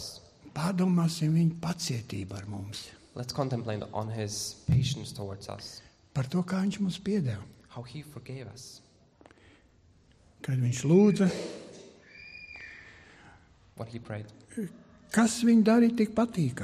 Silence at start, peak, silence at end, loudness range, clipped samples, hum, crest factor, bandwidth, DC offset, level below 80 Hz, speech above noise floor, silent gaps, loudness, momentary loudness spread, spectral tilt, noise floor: 0 s; -12 dBFS; 0 s; 12 LU; under 0.1%; none; 18 dB; 14.5 kHz; under 0.1%; -60 dBFS; 33 dB; none; -29 LUFS; 22 LU; -6 dB/octave; -61 dBFS